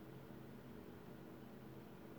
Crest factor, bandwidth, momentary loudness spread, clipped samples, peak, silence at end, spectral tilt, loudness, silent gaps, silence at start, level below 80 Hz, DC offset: 12 dB; over 20 kHz; 0 LU; under 0.1%; -42 dBFS; 0 s; -7 dB/octave; -57 LUFS; none; 0 s; -74 dBFS; under 0.1%